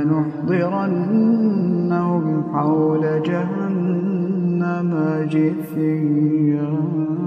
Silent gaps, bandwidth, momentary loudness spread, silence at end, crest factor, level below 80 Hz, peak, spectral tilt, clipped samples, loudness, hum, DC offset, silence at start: none; 13 kHz; 4 LU; 0 s; 12 dB; -64 dBFS; -6 dBFS; -10.5 dB/octave; under 0.1%; -19 LUFS; none; under 0.1%; 0 s